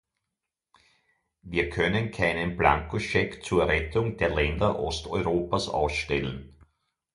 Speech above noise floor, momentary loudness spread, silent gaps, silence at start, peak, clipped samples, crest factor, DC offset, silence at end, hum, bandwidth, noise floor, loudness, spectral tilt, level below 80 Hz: 59 dB; 6 LU; none; 1.45 s; -6 dBFS; under 0.1%; 22 dB; under 0.1%; 0.65 s; none; 11.5 kHz; -86 dBFS; -27 LUFS; -5.5 dB/octave; -42 dBFS